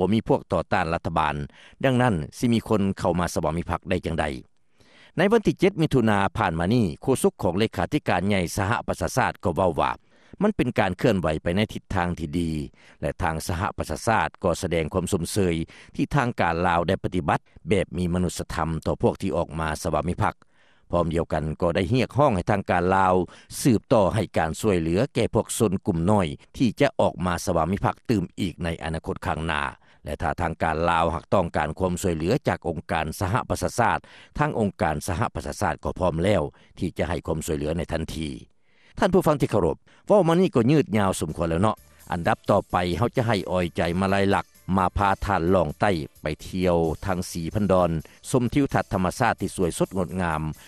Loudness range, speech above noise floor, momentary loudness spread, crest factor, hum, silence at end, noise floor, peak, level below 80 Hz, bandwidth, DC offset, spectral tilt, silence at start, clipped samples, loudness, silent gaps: 4 LU; 34 dB; 8 LU; 18 dB; none; 0.15 s; -58 dBFS; -6 dBFS; -42 dBFS; 13.5 kHz; under 0.1%; -6 dB/octave; 0 s; under 0.1%; -24 LUFS; none